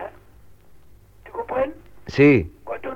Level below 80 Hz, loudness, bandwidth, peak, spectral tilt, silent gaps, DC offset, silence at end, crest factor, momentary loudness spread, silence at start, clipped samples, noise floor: -46 dBFS; -20 LUFS; 7.2 kHz; -4 dBFS; -8 dB/octave; none; under 0.1%; 0 s; 20 dB; 21 LU; 0 s; under 0.1%; -51 dBFS